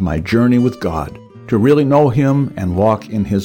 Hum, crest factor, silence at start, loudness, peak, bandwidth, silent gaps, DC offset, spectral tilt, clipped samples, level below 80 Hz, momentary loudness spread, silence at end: none; 12 dB; 0 s; -15 LUFS; -2 dBFS; 17 kHz; none; under 0.1%; -8.5 dB/octave; under 0.1%; -36 dBFS; 10 LU; 0 s